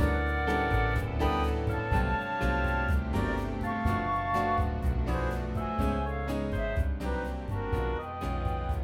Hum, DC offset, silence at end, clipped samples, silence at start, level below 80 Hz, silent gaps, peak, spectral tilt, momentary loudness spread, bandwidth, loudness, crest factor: none; under 0.1%; 0 s; under 0.1%; 0 s; -34 dBFS; none; -14 dBFS; -7.5 dB/octave; 5 LU; 14.5 kHz; -30 LUFS; 16 dB